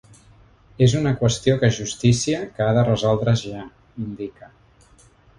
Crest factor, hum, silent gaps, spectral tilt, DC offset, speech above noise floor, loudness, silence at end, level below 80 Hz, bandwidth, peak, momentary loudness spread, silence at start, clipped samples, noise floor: 18 dB; none; none; -6 dB/octave; under 0.1%; 33 dB; -20 LUFS; 1.1 s; -46 dBFS; 11.5 kHz; -4 dBFS; 15 LU; 0.8 s; under 0.1%; -53 dBFS